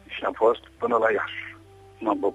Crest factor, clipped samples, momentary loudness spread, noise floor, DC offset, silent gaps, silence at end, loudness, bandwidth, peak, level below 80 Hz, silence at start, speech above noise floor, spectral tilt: 18 dB; under 0.1%; 11 LU; -49 dBFS; under 0.1%; none; 0 s; -25 LUFS; 10.5 kHz; -8 dBFS; -60 dBFS; 0.1 s; 25 dB; -6 dB/octave